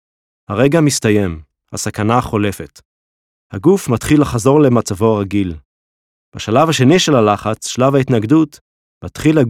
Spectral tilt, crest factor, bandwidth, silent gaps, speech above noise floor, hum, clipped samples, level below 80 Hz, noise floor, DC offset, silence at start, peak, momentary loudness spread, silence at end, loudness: -5.5 dB/octave; 14 dB; 16 kHz; 2.85-3.50 s, 5.65-6.32 s, 8.61-9.01 s; over 77 dB; none; under 0.1%; -42 dBFS; under -90 dBFS; under 0.1%; 0.5 s; 0 dBFS; 17 LU; 0 s; -14 LUFS